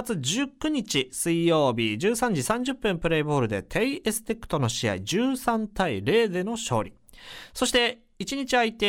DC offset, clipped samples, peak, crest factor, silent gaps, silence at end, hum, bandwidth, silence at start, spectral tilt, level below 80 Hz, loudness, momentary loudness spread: under 0.1%; under 0.1%; -10 dBFS; 16 dB; none; 0 s; none; 17.5 kHz; 0 s; -4 dB/octave; -50 dBFS; -26 LUFS; 7 LU